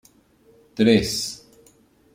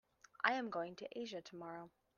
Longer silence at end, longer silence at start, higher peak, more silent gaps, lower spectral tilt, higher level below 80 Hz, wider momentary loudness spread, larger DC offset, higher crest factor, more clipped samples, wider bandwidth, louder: first, 0.8 s vs 0.3 s; first, 0.75 s vs 0.4 s; first, -4 dBFS vs -16 dBFS; neither; about the same, -4.5 dB/octave vs -4 dB/octave; first, -50 dBFS vs -86 dBFS; first, 21 LU vs 14 LU; neither; second, 20 dB vs 28 dB; neither; first, 16 kHz vs 7.2 kHz; first, -20 LUFS vs -43 LUFS